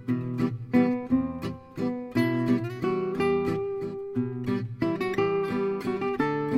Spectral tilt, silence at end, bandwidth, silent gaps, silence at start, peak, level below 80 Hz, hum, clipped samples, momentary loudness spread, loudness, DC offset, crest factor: -8 dB/octave; 0 s; 14.5 kHz; none; 0 s; -10 dBFS; -56 dBFS; none; under 0.1%; 7 LU; -28 LUFS; under 0.1%; 16 dB